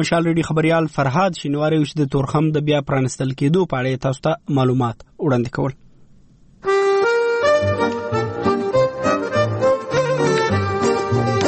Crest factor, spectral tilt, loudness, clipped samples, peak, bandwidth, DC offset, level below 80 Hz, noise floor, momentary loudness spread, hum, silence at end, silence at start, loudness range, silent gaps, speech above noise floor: 14 dB; -6.5 dB/octave; -19 LUFS; under 0.1%; -6 dBFS; 8.8 kHz; under 0.1%; -48 dBFS; -48 dBFS; 5 LU; none; 0 s; 0 s; 2 LU; none; 30 dB